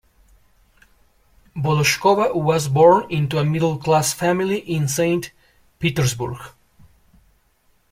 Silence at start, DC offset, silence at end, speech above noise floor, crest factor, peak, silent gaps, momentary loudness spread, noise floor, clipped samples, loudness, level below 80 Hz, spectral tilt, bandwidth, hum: 1.55 s; under 0.1%; 1.45 s; 43 dB; 18 dB; -2 dBFS; none; 12 LU; -61 dBFS; under 0.1%; -19 LUFS; -52 dBFS; -5 dB/octave; 16.5 kHz; none